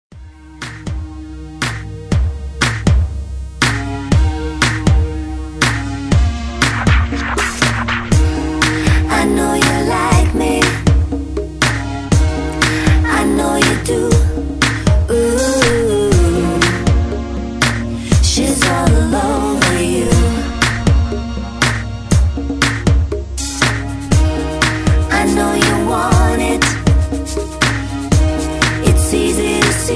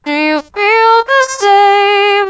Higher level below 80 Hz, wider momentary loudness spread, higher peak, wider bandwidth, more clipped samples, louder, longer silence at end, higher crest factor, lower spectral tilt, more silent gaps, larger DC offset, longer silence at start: first, -20 dBFS vs -54 dBFS; about the same, 8 LU vs 6 LU; about the same, 0 dBFS vs 0 dBFS; first, 11 kHz vs 8 kHz; neither; second, -15 LUFS vs -9 LUFS; about the same, 0 s vs 0 s; about the same, 14 dB vs 10 dB; first, -5 dB/octave vs -1 dB/octave; neither; first, 0.3% vs under 0.1%; about the same, 0.15 s vs 0.05 s